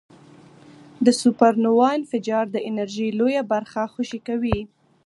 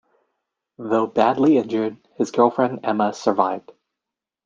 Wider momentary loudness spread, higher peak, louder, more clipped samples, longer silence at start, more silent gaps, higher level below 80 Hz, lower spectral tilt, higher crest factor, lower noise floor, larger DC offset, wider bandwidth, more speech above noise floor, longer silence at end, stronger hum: about the same, 10 LU vs 10 LU; about the same, -2 dBFS vs -2 dBFS; about the same, -21 LUFS vs -20 LUFS; neither; first, 1 s vs 0.8 s; neither; first, -48 dBFS vs -66 dBFS; about the same, -5.5 dB/octave vs -6.5 dB/octave; about the same, 20 dB vs 20 dB; second, -48 dBFS vs -86 dBFS; neither; first, 11.5 kHz vs 7.6 kHz; second, 27 dB vs 67 dB; second, 0.4 s vs 0.85 s; neither